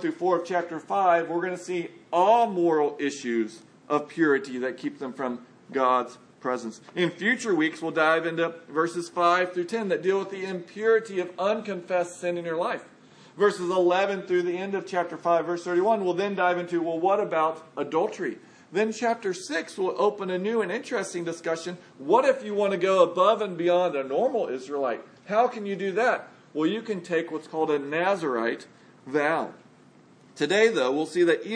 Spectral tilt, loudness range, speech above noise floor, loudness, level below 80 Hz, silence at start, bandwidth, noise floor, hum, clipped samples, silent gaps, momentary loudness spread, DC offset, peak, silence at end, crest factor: -5 dB/octave; 4 LU; 29 dB; -26 LUFS; -84 dBFS; 0 s; 10.5 kHz; -55 dBFS; none; under 0.1%; none; 10 LU; under 0.1%; -6 dBFS; 0 s; 18 dB